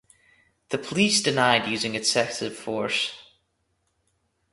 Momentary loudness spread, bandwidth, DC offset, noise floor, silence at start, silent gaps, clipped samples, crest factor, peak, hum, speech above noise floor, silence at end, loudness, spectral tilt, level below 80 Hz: 11 LU; 11.5 kHz; under 0.1%; -73 dBFS; 0.7 s; none; under 0.1%; 22 dB; -4 dBFS; none; 49 dB; 1.3 s; -24 LUFS; -2.5 dB/octave; -66 dBFS